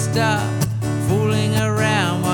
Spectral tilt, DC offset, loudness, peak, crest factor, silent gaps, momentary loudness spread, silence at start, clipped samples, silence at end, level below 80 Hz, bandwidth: -5.5 dB/octave; under 0.1%; -19 LUFS; -4 dBFS; 14 dB; none; 4 LU; 0 s; under 0.1%; 0 s; -44 dBFS; 18 kHz